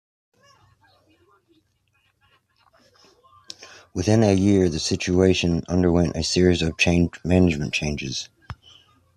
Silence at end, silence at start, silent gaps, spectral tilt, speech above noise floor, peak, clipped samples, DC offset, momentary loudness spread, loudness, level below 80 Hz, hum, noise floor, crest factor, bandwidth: 0.6 s; 3.6 s; none; -5.5 dB/octave; 47 dB; -4 dBFS; under 0.1%; under 0.1%; 22 LU; -21 LUFS; -46 dBFS; none; -67 dBFS; 18 dB; 11.5 kHz